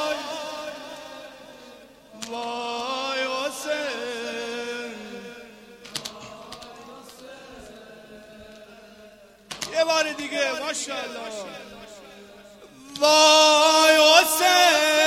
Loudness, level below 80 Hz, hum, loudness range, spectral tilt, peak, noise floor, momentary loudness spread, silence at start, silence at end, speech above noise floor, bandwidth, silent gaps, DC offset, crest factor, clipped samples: -20 LUFS; -64 dBFS; none; 22 LU; 0 dB/octave; -2 dBFS; -50 dBFS; 27 LU; 0 s; 0 s; 31 dB; 16.5 kHz; none; under 0.1%; 22 dB; under 0.1%